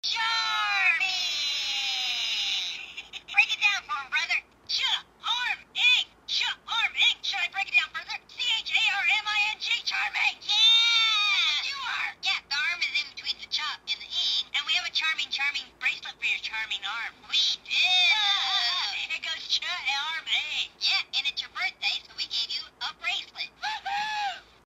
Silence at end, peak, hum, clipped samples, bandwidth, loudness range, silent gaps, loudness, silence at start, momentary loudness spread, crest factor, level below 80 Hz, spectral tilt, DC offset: 0.3 s; -8 dBFS; none; under 0.1%; 16 kHz; 5 LU; none; -25 LUFS; 0.05 s; 10 LU; 20 dB; -68 dBFS; 2.5 dB/octave; under 0.1%